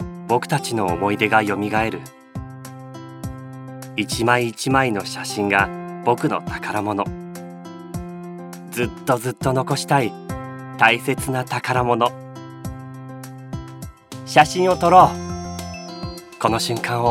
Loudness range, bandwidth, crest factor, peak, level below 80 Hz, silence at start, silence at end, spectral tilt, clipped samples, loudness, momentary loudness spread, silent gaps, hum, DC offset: 6 LU; 17 kHz; 20 dB; 0 dBFS; -46 dBFS; 0 s; 0 s; -5 dB/octave; under 0.1%; -20 LUFS; 20 LU; none; none; under 0.1%